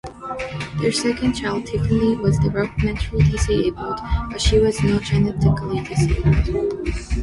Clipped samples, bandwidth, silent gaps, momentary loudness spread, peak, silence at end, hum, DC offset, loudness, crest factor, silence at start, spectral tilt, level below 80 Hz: under 0.1%; 11.5 kHz; none; 8 LU; -4 dBFS; 0 s; none; under 0.1%; -20 LUFS; 16 dB; 0.05 s; -6 dB/octave; -28 dBFS